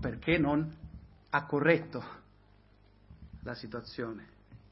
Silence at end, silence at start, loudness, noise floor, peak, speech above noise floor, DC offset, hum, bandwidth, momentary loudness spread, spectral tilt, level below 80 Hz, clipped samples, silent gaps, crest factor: 0.15 s; 0 s; -32 LUFS; -62 dBFS; -12 dBFS; 30 dB; under 0.1%; 50 Hz at -65 dBFS; 5.8 kHz; 23 LU; -10 dB/octave; -54 dBFS; under 0.1%; none; 24 dB